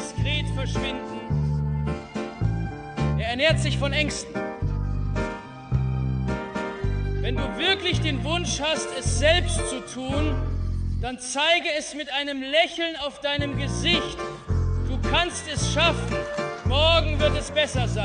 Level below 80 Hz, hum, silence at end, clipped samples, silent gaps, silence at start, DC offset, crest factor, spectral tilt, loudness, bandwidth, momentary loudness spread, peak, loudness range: -32 dBFS; none; 0 s; under 0.1%; none; 0 s; under 0.1%; 18 dB; -4.5 dB/octave; -25 LUFS; 10.5 kHz; 9 LU; -6 dBFS; 4 LU